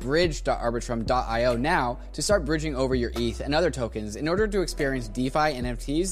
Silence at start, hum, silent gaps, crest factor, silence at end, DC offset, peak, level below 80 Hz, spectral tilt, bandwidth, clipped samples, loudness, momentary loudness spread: 0 s; none; none; 16 dB; 0 s; 0.3%; -8 dBFS; -36 dBFS; -5 dB/octave; 15.5 kHz; under 0.1%; -26 LUFS; 6 LU